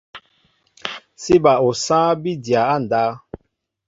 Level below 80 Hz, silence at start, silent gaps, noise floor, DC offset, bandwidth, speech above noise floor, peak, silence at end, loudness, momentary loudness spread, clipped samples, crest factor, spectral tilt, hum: -54 dBFS; 0.15 s; none; -69 dBFS; under 0.1%; 8 kHz; 53 dB; -2 dBFS; 0.5 s; -17 LUFS; 16 LU; under 0.1%; 18 dB; -5 dB/octave; none